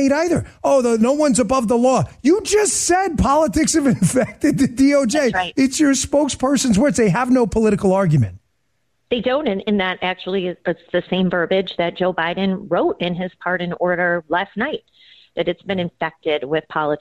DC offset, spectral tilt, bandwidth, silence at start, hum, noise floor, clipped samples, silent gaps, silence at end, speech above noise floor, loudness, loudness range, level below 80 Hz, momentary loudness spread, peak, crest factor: under 0.1%; -5 dB/octave; 13.5 kHz; 0 s; none; -70 dBFS; under 0.1%; none; 0 s; 53 dB; -18 LUFS; 5 LU; -42 dBFS; 8 LU; -6 dBFS; 12 dB